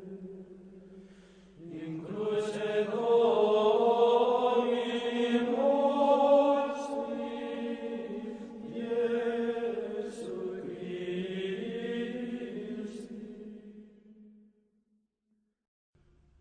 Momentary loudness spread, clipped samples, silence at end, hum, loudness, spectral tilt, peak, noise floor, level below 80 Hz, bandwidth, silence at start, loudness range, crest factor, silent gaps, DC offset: 18 LU; under 0.1%; 2.1 s; none; -30 LUFS; -6 dB/octave; -14 dBFS; -78 dBFS; -72 dBFS; 10 kHz; 0 s; 14 LU; 18 dB; none; under 0.1%